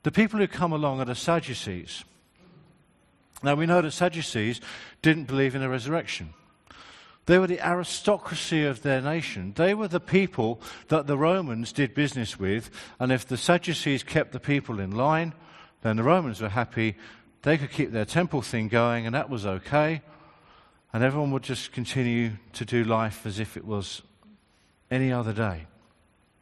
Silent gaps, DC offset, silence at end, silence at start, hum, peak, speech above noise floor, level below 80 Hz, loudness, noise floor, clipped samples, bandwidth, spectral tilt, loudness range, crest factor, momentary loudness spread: none; under 0.1%; 0.75 s; 0.05 s; none; -4 dBFS; 38 dB; -58 dBFS; -26 LUFS; -64 dBFS; under 0.1%; 12.5 kHz; -6 dB/octave; 4 LU; 22 dB; 10 LU